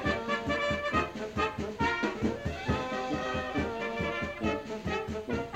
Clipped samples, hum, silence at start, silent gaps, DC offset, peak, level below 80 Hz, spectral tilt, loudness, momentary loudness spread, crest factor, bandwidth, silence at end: under 0.1%; none; 0 s; none; under 0.1%; -16 dBFS; -48 dBFS; -5.5 dB/octave; -32 LUFS; 5 LU; 16 dB; 16 kHz; 0 s